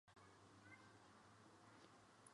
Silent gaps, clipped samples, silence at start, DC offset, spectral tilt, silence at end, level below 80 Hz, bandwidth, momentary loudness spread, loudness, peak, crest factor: none; under 0.1%; 0.05 s; under 0.1%; -4 dB/octave; 0 s; -88 dBFS; 11 kHz; 3 LU; -67 LUFS; -48 dBFS; 20 dB